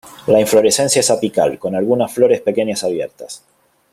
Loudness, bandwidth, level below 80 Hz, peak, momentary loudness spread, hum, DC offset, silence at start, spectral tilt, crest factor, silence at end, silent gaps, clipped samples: -15 LUFS; 16 kHz; -56 dBFS; 0 dBFS; 14 LU; none; under 0.1%; 0.05 s; -3.5 dB/octave; 16 dB; 0.55 s; none; under 0.1%